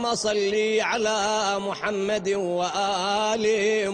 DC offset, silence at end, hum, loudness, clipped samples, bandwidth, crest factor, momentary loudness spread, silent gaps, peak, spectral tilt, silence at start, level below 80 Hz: under 0.1%; 0 s; none; -24 LUFS; under 0.1%; 10 kHz; 14 dB; 3 LU; none; -10 dBFS; -3 dB/octave; 0 s; -60 dBFS